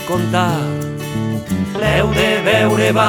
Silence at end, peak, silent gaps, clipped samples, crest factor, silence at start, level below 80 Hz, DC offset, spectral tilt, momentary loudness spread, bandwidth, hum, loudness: 0 s; 0 dBFS; none; under 0.1%; 16 dB; 0 s; -36 dBFS; under 0.1%; -5.5 dB/octave; 9 LU; 19.5 kHz; none; -16 LUFS